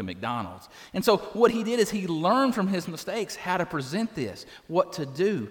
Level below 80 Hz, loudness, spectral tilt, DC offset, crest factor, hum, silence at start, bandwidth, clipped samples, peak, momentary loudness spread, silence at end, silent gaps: -62 dBFS; -27 LUFS; -5.5 dB/octave; under 0.1%; 20 dB; none; 0 s; 19 kHz; under 0.1%; -6 dBFS; 11 LU; 0 s; none